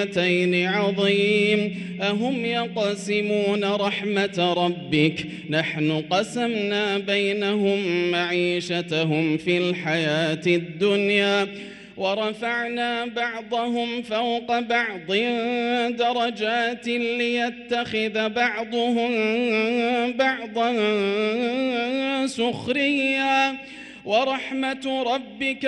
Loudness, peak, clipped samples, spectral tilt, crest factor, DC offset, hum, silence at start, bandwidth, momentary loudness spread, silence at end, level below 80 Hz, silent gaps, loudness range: -23 LUFS; -6 dBFS; under 0.1%; -5 dB/octave; 16 dB; under 0.1%; none; 0 s; 11.5 kHz; 5 LU; 0 s; -64 dBFS; none; 2 LU